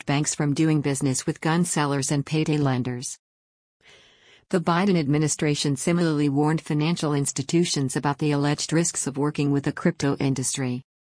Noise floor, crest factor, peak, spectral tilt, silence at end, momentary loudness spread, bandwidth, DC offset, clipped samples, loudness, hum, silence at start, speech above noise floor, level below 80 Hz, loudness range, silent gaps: -56 dBFS; 14 dB; -10 dBFS; -5 dB/octave; 0.2 s; 4 LU; 10.5 kHz; under 0.1%; under 0.1%; -24 LUFS; none; 0.05 s; 32 dB; -58 dBFS; 3 LU; 3.19-3.80 s